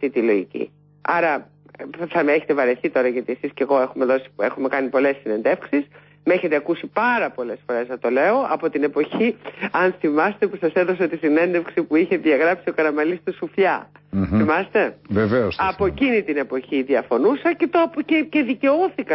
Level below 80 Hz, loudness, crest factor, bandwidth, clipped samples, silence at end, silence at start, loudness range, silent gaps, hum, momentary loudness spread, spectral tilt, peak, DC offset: -50 dBFS; -20 LUFS; 14 dB; 5.8 kHz; under 0.1%; 0 s; 0 s; 2 LU; none; 50 Hz at -55 dBFS; 7 LU; -11 dB/octave; -6 dBFS; under 0.1%